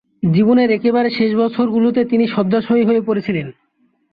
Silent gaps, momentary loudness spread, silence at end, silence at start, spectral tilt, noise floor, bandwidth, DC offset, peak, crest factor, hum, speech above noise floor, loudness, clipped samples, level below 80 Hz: none; 6 LU; 0.6 s; 0.25 s; -10.5 dB/octave; -61 dBFS; 5 kHz; under 0.1%; -4 dBFS; 12 dB; none; 47 dB; -16 LUFS; under 0.1%; -56 dBFS